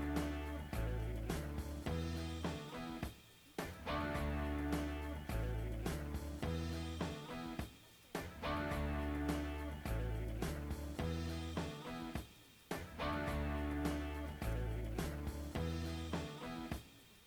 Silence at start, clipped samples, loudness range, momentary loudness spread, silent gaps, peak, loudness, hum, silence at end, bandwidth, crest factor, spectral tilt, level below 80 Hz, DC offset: 0 s; under 0.1%; 2 LU; 7 LU; none; -24 dBFS; -43 LUFS; none; 0 s; over 20 kHz; 18 dB; -6 dB/octave; -46 dBFS; under 0.1%